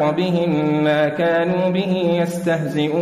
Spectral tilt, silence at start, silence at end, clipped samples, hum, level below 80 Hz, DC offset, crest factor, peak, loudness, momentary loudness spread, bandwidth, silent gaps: -7 dB/octave; 0 s; 0 s; under 0.1%; none; -58 dBFS; under 0.1%; 10 dB; -8 dBFS; -19 LUFS; 3 LU; 14.5 kHz; none